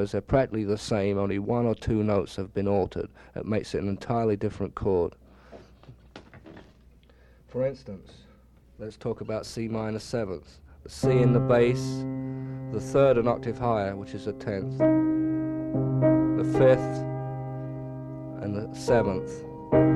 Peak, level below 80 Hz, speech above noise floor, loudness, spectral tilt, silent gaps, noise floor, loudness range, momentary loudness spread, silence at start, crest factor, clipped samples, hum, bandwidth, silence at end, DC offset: -8 dBFS; -48 dBFS; 29 dB; -27 LUFS; -7.5 dB/octave; none; -55 dBFS; 11 LU; 15 LU; 0 s; 20 dB; under 0.1%; none; 12 kHz; 0 s; under 0.1%